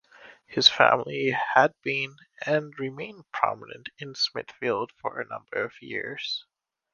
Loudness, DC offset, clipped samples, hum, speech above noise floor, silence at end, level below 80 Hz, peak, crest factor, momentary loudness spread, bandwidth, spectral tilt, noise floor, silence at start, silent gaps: -26 LUFS; under 0.1%; under 0.1%; none; 25 dB; 0.5 s; -72 dBFS; -2 dBFS; 26 dB; 16 LU; 9.8 kHz; -3.5 dB/octave; -52 dBFS; 0.25 s; none